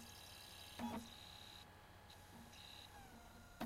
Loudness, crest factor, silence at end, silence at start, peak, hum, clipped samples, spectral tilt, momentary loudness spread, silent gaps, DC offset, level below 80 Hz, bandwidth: -55 LUFS; 24 dB; 0 s; 0 s; -32 dBFS; none; under 0.1%; -3.5 dB/octave; 12 LU; none; under 0.1%; -70 dBFS; 16 kHz